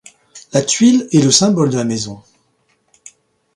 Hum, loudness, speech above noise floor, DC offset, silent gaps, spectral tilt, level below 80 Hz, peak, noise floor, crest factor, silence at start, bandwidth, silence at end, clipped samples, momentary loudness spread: none; -13 LUFS; 48 dB; under 0.1%; none; -4.5 dB/octave; -56 dBFS; 0 dBFS; -61 dBFS; 16 dB; 0.35 s; 11.5 kHz; 1.35 s; under 0.1%; 10 LU